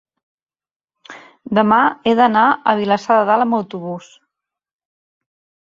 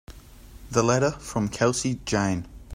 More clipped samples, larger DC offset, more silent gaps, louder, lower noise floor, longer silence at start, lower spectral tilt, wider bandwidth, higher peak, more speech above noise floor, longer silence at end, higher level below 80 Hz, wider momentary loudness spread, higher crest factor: neither; neither; neither; first, -15 LUFS vs -25 LUFS; first, under -90 dBFS vs -46 dBFS; first, 1.1 s vs 0.1 s; first, -6.5 dB/octave vs -5 dB/octave; second, 7.6 kHz vs 16 kHz; first, -2 dBFS vs -8 dBFS; first, over 75 dB vs 22 dB; first, 1.65 s vs 0 s; second, -62 dBFS vs -46 dBFS; first, 14 LU vs 6 LU; about the same, 16 dB vs 18 dB